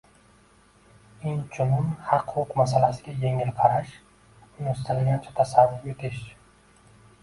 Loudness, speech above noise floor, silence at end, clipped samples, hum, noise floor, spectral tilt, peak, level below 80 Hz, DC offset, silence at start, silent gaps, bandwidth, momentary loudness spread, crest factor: -25 LUFS; 33 dB; 0.95 s; under 0.1%; none; -57 dBFS; -7.5 dB/octave; -4 dBFS; -54 dBFS; under 0.1%; 1.2 s; none; 11.5 kHz; 13 LU; 22 dB